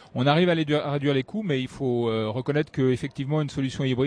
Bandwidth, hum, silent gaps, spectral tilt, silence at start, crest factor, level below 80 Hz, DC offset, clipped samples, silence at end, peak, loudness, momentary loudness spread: 10 kHz; none; none; -7 dB/octave; 0.15 s; 18 dB; -56 dBFS; under 0.1%; under 0.1%; 0 s; -8 dBFS; -25 LUFS; 6 LU